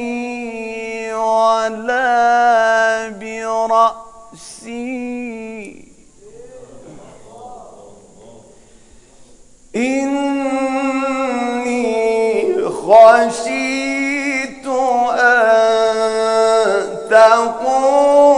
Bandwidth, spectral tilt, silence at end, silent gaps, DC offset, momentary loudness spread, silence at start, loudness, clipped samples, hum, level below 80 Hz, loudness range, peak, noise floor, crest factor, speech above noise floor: 11 kHz; -3 dB/octave; 0 s; none; under 0.1%; 16 LU; 0 s; -15 LUFS; 0.2%; none; -54 dBFS; 17 LU; 0 dBFS; -45 dBFS; 16 dB; 28 dB